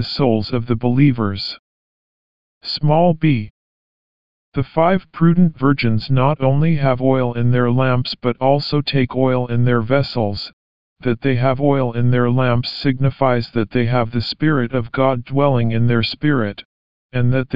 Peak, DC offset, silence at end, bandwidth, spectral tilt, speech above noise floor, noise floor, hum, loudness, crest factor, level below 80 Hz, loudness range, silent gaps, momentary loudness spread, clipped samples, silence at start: -2 dBFS; 3%; 0 s; 5.4 kHz; -6 dB/octave; over 74 dB; under -90 dBFS; none; -17 LUFS; 16 dB; -44 dBFS; 3 LU; 1.59-2.61 s, 3.50-4.52 s, 10.53-10.96 s, 16.65-17.09 s; 8 LU; under 0.1%; 0 s